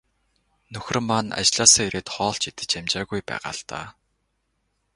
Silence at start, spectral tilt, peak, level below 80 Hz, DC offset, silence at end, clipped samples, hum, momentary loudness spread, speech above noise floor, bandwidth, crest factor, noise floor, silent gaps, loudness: 0.7 s; -1.5 dB/octave; 0 dBFS; -54 dBFS; under 0.1%; 1.05 s; under 0.1%; none; 21 LU; 49 dB; 11.5 kHz; 26 dB; -73 dBFS; none; -21 LUFS